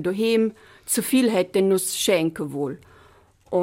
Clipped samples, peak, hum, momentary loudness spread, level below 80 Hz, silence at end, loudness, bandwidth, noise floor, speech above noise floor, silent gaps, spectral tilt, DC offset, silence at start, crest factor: under 0.1%; -8 dBFS; none; 10 LU; -62 dBFS; 0 s; -22 LUFS; 16.5 kHz; -54 dBFS; 32 dB; none; -4 dB/octave; under 0.1%; 0 s; 16 dB